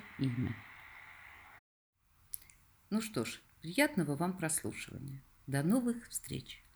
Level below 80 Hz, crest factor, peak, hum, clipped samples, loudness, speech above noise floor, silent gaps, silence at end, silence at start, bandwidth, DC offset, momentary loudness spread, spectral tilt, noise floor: -66 dBFS; 22 dB; -16 dBFS; none; under 0.1%; -37 LUFS; 27 dB; 1.59-1.93 s; 0.15 s; 0 s; over 20 kHz; under 0.1%; 20 LU; -5 dB/octave; -63 dBFS